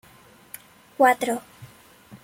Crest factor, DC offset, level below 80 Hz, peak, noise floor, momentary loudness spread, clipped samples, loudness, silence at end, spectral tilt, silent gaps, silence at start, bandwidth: 22 dB; under 0.1%; -68 dBFS; -6 dBFS; -52 dBFS; 23 LU; under 0.1%; -22 LUFS; 0.1 s; -3.5 dB/octave; none; 1 s; 16.5 kHz